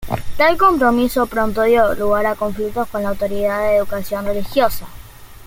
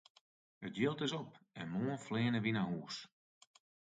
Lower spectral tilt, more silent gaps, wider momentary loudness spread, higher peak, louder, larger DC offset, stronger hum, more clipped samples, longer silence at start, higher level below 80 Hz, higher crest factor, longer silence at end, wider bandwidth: about the same, -5.5 dB/octave vs -6 dB/octave; neither; second, 9 LU vs 14 LU; first, 0 dBFS vs -22 dBFS; first, -17 LUFS vs -39 LUFS; neither; neither; neither; second, 0 s vs 0.6 s; first, -36 dBFS vs -76 dBFS; about the same, 16 dB vs 18 dB; second, 0 s vs 0.9 s; first, 17 kHz vs 9 kHz